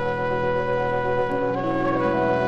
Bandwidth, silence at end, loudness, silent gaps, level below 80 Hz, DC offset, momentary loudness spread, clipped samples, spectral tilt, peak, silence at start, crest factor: 7.4 kHz; 0 s; -23 LUFS; none; -46 dBFS; under 0.1%; 2 LU; under 0.1%; -8 dB/octave; -8 dBFS; 0 s; 14 dB